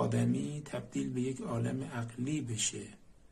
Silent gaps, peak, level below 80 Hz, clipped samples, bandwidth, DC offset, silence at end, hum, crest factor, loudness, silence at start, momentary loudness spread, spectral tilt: none; -20 dBFS; -64 dBFS; under 0.1%; 12.5 kHz; under 0.1%; 0.2 s; none; 16 dB; -36 LUFS; 0 s; 8 LU; -5 dB/octave